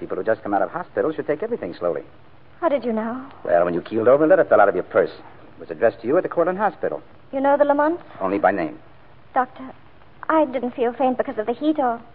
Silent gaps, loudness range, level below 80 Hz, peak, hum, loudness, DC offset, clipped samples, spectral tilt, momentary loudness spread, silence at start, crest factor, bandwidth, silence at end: none; 5 LU; -60 dBFS; -2 dBFS; none; -21 LUFS; 0.5%; under 0.1%; -11 dB/octave; 12 LU; 0 s; 18 dB; 4.8 kHz; 0.1 s